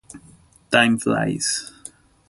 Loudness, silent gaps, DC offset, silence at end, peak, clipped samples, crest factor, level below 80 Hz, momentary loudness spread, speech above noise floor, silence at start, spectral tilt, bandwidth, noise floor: -20 LUFS; none; under 0.1%; 0.4 s; -2 dBFS; under 0.1%; 22 dB; -56 dBFS; 23 LU; 32 dB; 0.15 s; -3.5 dB/octave; 11.5 kHz; -51 dBFS